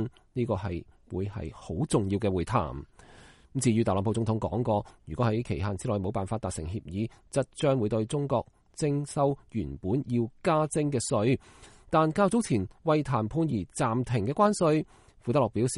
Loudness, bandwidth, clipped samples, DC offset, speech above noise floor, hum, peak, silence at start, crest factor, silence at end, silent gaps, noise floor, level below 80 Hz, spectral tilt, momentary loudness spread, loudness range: -29 LUFS; 11.5 kHz; under 0.1%; under 0.1%; 26 dB; none; -10 dBFS; 0 s; 18 dB; 0 s; none; -54 dBFS; -52 dBFS; -6.5 dB/octave; 10 LU; 4 LU